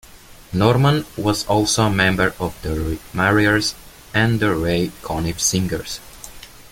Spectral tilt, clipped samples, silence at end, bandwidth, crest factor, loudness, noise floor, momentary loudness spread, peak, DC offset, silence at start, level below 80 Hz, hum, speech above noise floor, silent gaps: -4.5 dB/octave; under 0.1%; 0.05 s; 17 kHz; 18 dB; -19 LUFS; -43 dBFS; 12 LU; -2 dBFS; under 0.1%; 0.15 s; -38 dBFS; none; 24 dB; none